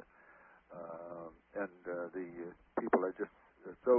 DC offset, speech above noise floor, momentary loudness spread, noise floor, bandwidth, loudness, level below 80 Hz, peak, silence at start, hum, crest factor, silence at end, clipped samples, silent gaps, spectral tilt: under 0.1%; 27 dB; 21 LU; -62 dBFS; 3.3 kHz; -41 LUFS; -74 dBFS; -14 dBFS; 0.3 s; none; 24 dB; 0 s; under 0.1%; none; -1 dB/octave